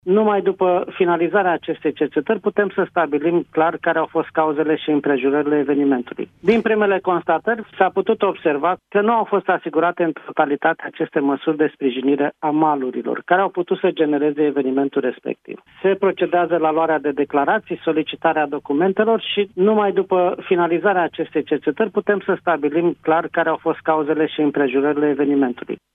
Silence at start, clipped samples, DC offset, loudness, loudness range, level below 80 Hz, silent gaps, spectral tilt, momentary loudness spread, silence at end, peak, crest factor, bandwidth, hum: 0.05 s; under 0.1%; under 0.1%; -19 LUFS; 1 LU; -66 dBFS; none; -8.5 dB/octave; 4 LU; 0.2 s; -2 dBFS; 18 dB; 4.4 kHz; none